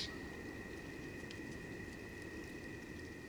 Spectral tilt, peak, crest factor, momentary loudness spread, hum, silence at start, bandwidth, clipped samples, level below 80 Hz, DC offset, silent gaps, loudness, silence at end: -4.5 dB/octave; -30 dBFS; 18 dB; 1 LU; none; 0 s; over 20 kHz; under 0.1%; -60 dBFS; under 0.1%; none; -48 LUFS; 0 s